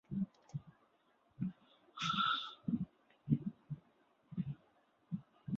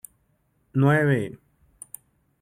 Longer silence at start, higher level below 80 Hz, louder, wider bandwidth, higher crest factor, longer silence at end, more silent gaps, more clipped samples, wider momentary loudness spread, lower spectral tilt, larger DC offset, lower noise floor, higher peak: second, 0.1 s vs 0.75 s; second, -70 dBFS vs -62 dBFS; second, -41 LUFS vs -23 LUFS; second, 7.4 kHz vs 15 kHz; first, 24 dB vs 16 dB; second, 0 s vs 1.1 s; neither; neither; second, 16 LU vs 22 LU; second, -4 dB/octave vs -7.5 dB/octave; neither; first, -74 dBFS vs -68 dBFS; second, -18 dBFS vs -10 dBFS